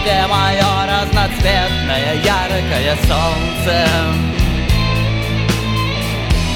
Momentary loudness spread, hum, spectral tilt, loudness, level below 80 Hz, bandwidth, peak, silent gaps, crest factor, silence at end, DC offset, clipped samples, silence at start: 4 LU; none; -5 dB/octave; -15 LUFS; -22 dBFS; 18 kHz; 0 dBFS; none; 14 dB; 0 s; under 0.1%; under 0.1%; 0 s